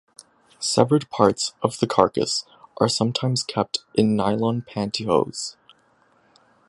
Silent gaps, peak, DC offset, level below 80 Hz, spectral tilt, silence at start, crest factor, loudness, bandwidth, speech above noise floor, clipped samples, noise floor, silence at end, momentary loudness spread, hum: none; 0 dBFS; under 0.1%; -58 dBFS; -5 dB/octave; 0.6 s; 22 dB; -22 LUFS; 11.5 kHz; 39 dB; under 0.1%; -61 dBFS; 1.15 s; 8 LU; none